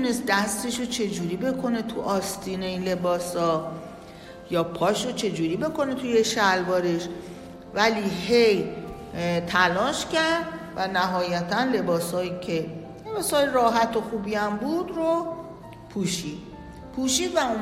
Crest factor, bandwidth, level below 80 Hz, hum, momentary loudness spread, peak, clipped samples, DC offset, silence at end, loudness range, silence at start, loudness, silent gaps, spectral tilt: 18 dB; 16 kHz; -54 dBFS; none; 15 LU; -6 dBFS; under 0.1%; under 0.1%; 0 s; 4 LU; 0 s; -25 LUFS; none; -4 dB/octave